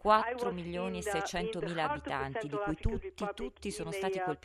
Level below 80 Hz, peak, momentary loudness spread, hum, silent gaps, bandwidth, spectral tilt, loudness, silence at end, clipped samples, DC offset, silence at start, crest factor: -48 dBFS; -12 dBFS; 5 LU; none; none; 13.5 kHz; -5 dB/octave; -35 LUFS; 0.05 s; under 0.1%; under 0.1%; 0.05 s; 22 dB